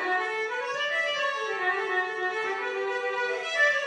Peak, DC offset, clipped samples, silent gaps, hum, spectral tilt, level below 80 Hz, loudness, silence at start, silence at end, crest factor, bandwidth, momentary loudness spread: -12 dBFS; under 0.1%; under 0.1%; none; none; -1 dB/octave; under -90 dBFS; -27 LUFS; 0 s; 0 s; 16 dB; 10.5 kHz; 4 LU